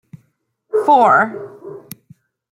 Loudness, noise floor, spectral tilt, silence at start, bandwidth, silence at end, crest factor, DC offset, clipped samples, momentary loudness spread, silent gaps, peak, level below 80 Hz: -14 LUFS; -65 dBFS; -5.5 dB/octave; 0.75 s; 16.5 kHz; 0.75 s; 16 dB; under 0.1%; under 0.1%; 24 LU; none; -2 dBFS; -70 dBFS